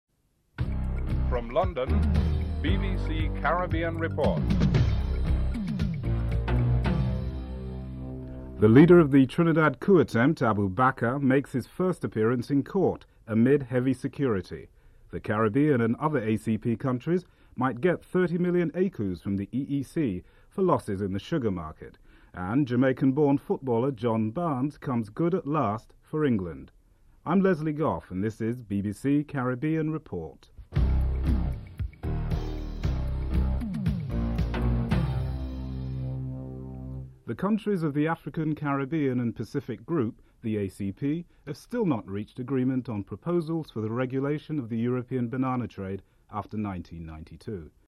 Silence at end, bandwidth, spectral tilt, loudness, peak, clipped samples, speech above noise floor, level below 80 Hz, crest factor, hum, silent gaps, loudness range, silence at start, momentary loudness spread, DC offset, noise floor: 0.2 s; 12.5 kHz; -8.5 dB/octave; -27 LUFS; -6 dBFS; under 0.1%; 42 dB; -36 dBFS; 20 dB; none; none; 8 LU; 0.6 s; 14 LU; under 0.1%; -68 dBFS